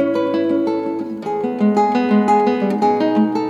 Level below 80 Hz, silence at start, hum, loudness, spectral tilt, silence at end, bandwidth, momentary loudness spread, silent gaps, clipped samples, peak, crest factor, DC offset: -64 dBFS; 0 s; none; -17 LUFS; -7.5 dB/octave; 0 s; 7.6 kHz; 8 LU; none; under 0.1%; -4 dBFS; 12 dB; under 0.1%